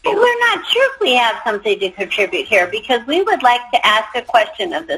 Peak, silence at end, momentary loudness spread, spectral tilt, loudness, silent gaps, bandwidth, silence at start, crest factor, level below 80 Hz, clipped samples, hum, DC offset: 0 dBFS; 0 s; 6 LU; -2 dB/octave; -15 LUFS; none; 15 kHz; 0.05 s; 16 dB; -56 dBFS; under 0.1%; none; under 0.1%